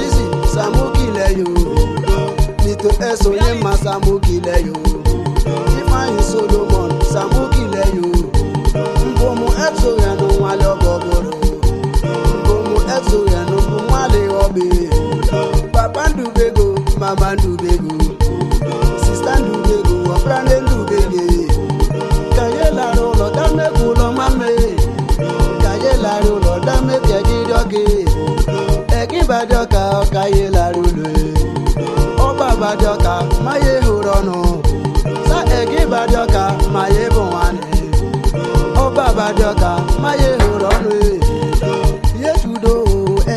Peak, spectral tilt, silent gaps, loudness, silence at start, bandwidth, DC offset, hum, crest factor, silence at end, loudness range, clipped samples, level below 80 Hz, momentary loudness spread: 0 dBFS; -6 dB/octave; none; -15 LUFS; 0 s; 13.5 kHz; under 0.1%; none; 12 dB; 0 s; 1 LU; under 0.1%; -16 dBFS; 3 LU